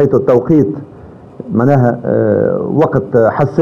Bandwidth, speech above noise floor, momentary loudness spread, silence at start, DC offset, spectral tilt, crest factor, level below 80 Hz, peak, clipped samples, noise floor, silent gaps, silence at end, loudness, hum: 7 kHz; 23 dB; 8 LU; 0 s; under 0.1%; -10.5 dB/octave; 12 dB; -44 dBFS; 0 dBFS; under 0.1%; -35 dBFS; none; 0 s; -12 LUFS; none